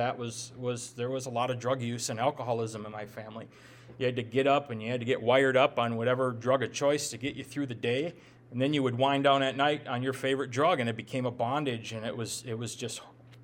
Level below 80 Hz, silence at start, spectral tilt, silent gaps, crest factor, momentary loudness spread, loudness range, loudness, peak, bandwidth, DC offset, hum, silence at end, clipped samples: -70 dBFS; 0 s; -4.5 dB/octave; none; 20 dB; 12 LU; 6 LU; -30 LUFS; -10 dBFS; 17 kHz; under 0.1%; none; 0 s; under 0.1%